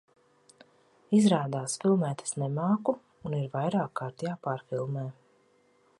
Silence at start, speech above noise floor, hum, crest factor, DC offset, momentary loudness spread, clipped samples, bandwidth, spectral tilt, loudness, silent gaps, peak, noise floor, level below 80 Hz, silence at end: 1.1 s; 37 dB; none; 20 dB; under 0.1%; 11 LU; under 0.1%; 11.5 kHz; -6 dB/octave; -30 LUFS; none; -10 dBFS; -66 dBFS; -72 dBFS; 0.9 s